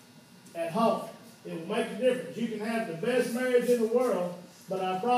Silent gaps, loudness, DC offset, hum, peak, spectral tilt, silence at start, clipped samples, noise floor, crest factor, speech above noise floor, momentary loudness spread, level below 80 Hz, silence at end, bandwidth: none; -29 LUFS; under 0.1%; none; -12 dBFS; -5.5 dB/octave; 0.15 s; under 0.1%; -53 dBFS; 16 dB; 25 dB; 15 LU; -84 dBFS; 0 s; 15.5 kHz